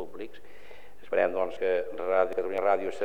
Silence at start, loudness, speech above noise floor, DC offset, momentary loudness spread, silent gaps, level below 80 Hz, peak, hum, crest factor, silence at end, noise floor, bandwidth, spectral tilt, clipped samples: 0 s; -28 LUFS; 24 dB; 1%; 13 LU; none; -66 dBFS; -12 dBFS; none; 18 dB; 0 s; -52 dBFS; 17.5 kHz; -5.5 dB/octave; under 0.1%